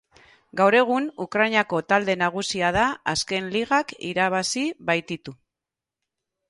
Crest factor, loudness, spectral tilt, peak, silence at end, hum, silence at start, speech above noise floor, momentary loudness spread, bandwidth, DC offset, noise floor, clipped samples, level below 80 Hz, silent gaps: 18 dB; -23 LUFS; -3.5 dB/octave; -6 dBFS; 1.15 s; none; 0.55 s; 65 dB; 8 LU; 11.5 kHz; under 0.1%; -88 dBFS; under 0.1%; -54 dBFS; none